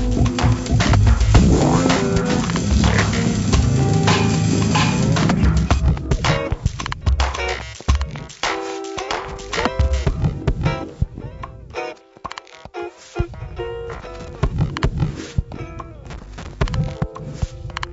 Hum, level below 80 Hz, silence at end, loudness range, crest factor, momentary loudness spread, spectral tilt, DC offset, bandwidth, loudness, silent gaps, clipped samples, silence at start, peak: none; -24 dBFS; 0 s; 11 LU; 18 dB; 17 LU; -5.5 dB/octave; under 0.1%; 8 kHz; -20 LUFS; none; under 0.1%; 0 s; -2 dBFS